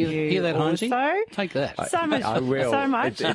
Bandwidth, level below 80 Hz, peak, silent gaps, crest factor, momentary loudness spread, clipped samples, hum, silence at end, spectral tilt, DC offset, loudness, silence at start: 11.5 kHz; -60 dBFS; -8 dBFS; none; 16 dB; 4 LU; under 0.1%; none; 0 s; -5.5 dB/octave; under 0.1%; -24 LUFS; 0 s